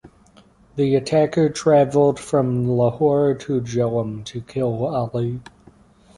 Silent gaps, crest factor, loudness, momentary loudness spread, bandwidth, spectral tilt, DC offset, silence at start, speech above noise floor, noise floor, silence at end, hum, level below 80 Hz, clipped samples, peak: none; 16 dB; -20 LUFS; 11 LU; 11.5 kHz; -7 dB/octave; under 0.1%; 0.05 s; 33 dB; -52 dBFS; 0.75 s; none; -52 dBFS; under 0.1%; -4 dBFS